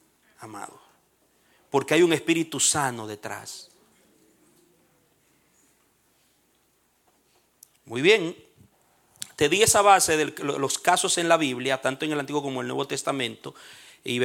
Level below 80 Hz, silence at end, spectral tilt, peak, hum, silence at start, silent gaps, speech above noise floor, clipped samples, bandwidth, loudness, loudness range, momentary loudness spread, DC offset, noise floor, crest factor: -64 dBFS; 0 s; -2.5 dB/octave; -4 dBFS; none; 0.4 s; none; 43 dB; under 0.1%; 17 kHz; -23 LUFS; 8 LU; 22 LU; under 0.1%; -67 dBFS; 22 dB